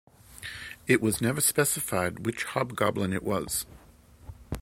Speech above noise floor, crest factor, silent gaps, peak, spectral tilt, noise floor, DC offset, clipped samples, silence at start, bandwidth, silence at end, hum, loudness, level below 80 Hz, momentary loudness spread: 27 dB; 24 dB; none; -6 dBFS; -4 dB/octave; -54 dBFS; under 0.1%; under 0.1%; 0.3 s; 16.5 kHz; 0 s; none; -27 LUFS; -52 dBFS; 16 LU